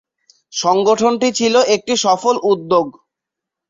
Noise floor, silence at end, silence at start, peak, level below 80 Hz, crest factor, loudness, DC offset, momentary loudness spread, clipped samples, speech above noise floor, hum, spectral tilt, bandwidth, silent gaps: -83 dBFS; 0.8 s; 0.55 s; -2 dBFS; -62 dBFS; 16 dB; -15 LUFS; under 0.1%; 5 LU; under 0.1%; 68 dB; none; -3 dB/octave; 7.8 kHz; none